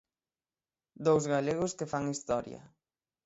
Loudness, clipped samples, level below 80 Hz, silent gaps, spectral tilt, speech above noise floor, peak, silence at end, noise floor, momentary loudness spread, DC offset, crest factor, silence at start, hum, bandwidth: -32 LUFS; under 0.1%; -66 dBFS; none; -5.5 dB/octave; over 59 dB; -14 dBFS; 0.6 s; under -90 dBFS; 10 LU; under 0.1%; 20 dB; 1 s; none; 8.2 kHz